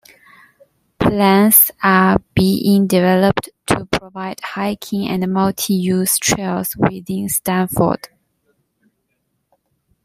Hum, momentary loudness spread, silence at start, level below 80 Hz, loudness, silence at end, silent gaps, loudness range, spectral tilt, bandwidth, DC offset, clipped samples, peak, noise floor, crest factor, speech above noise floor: none; 11 LU; 1 s; -44 dBFS; -16 LUFS; 2 s; none; 7 LU; -4.5 dB/octave; 16 kHz; under 0.1%; under 0.1%; 0 dBFS; -69 dBFS; 18 dB; 54 dB